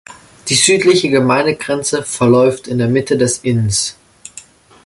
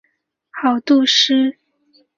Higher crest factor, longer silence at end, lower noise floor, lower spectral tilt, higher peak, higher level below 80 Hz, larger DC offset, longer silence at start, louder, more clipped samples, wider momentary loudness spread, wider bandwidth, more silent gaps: about the same, 14 dB vs 16 dB; second, 0.45 s vs 0.65 s; second, -40 dBFS vs -68 dBFS; first, -4 dB/octave vs -1.5 dB/octave; about the same, 0 dBFS vs -2 dBFS; first, -46 dBFS vs -68 dBFS; neither; second, 0.1 s vs 0.55 s; about the same, -13 LUFS vs -15 LUFS; neither; about the same, 12 LU vs 10 LU; first, 12 kHz vs 7.4 kHz; neither